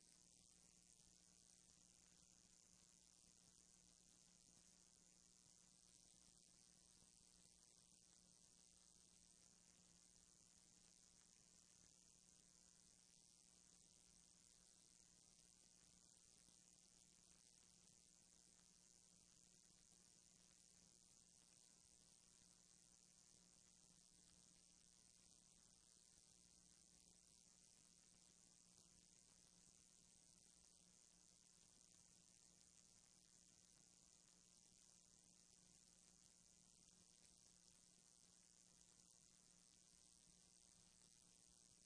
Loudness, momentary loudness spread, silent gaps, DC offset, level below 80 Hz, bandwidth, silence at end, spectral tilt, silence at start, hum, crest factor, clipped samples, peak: -70 LUFS; 0 LU; none; under 0.1%; -88 dBFS; 11 kHz; 0 s; -1.5 dB/octave; 0 s; none; 22 dB; under 0.1%; -50 dBFS